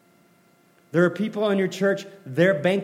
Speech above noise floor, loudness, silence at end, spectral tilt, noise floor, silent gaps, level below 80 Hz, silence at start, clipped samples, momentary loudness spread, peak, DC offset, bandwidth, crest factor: 37 dB; -23 LUFS; 0 s; -6.5 dB/octave; -59 dBFS; none; -76 dBFS; 0.95 s; under 0.1%; 8 LU; -6 dBFS; under 0.1%; 15.5 kHz; 18 dB